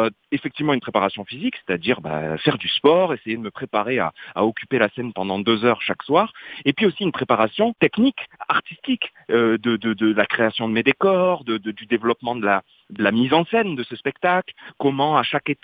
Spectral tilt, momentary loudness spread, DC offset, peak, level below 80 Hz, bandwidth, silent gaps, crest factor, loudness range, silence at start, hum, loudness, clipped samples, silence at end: -8.5 dB/octave; 8 LU; under 0.1%; -2 dBFS; -62 dBFS; 5 kHz; none; 20 dB; 1 LU; 0 s; none; -21 LUFS; under 0.1%; 0.1 s